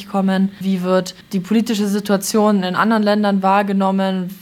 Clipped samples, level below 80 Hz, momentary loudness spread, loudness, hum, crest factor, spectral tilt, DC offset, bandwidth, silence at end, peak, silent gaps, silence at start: under 0.1%; -60 dBFS; 4 LU; -17 LUFS; none; 14 dB; -5.5 dB/octave; under 0.1%; 16 kHz; 0.05 s; -2 dBFS; none; 0 s